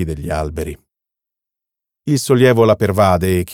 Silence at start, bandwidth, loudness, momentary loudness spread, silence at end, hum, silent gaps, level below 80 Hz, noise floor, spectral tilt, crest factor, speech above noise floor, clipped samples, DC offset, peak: 0 s; 18 kHz; -15 LUFS; 15 LU; 0 s; none; none; -36 dBFS; -85 dBFS; -6 dB/octave; 16 dB; 70 dB; under 0.1%; under 0.1%; -2 dBFS